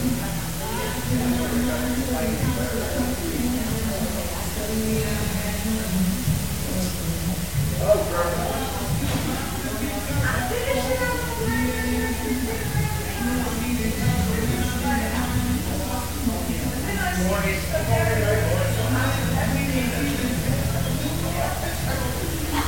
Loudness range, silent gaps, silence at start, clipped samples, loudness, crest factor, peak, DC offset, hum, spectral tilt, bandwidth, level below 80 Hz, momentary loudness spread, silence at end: 2 LU; none; 0 s; under 0.1%; -24 LUFS; 18 dB; -6 dBFS; 1%; none; -5 dB/octave; 17 kHz; -32 dBFS; 4 LU; 0 s